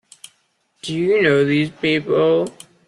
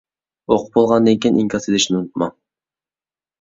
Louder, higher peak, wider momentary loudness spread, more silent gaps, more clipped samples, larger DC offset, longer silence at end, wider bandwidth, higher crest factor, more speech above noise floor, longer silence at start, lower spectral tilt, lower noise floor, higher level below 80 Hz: about the same, -18 LUFS vs -17 LUFS; about the same, -4 dBFS vs -2 dBFS; about the same, 12 LU vs 10 LU; neither; neither; neither; second, 0.4 s vs 1.1 s; first, 12.5 kHz vs 7.8 kHz; about the same, 16 dB vs 16 dB; second, 47 dB vs over 74 dB; first, 0.85 s vs 0.5 s; first, -6 dB/octave vs -4.5 dB/octave; second, -64 dBFS vs under -90 dBFS; second, -60 dBFS vs -54 dBFS